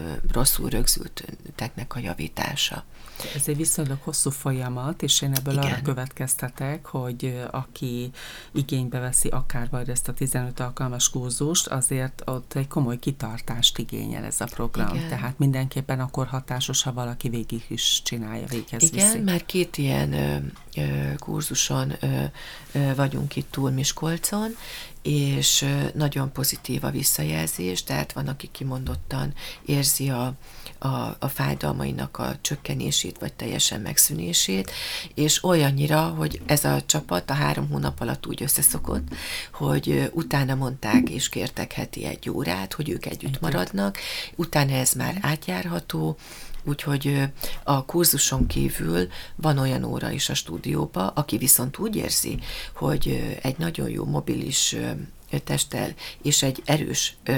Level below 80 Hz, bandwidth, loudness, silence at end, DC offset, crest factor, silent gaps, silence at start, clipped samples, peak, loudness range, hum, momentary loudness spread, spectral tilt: -38 dBFS; over 20 kHz; -24 LUFS; 0 s; under 0.1%; 24 dB; none; 0 s; under 0.1%; -2 dBFS; 4 LU; none; 11 LU; -3.5 dB/octave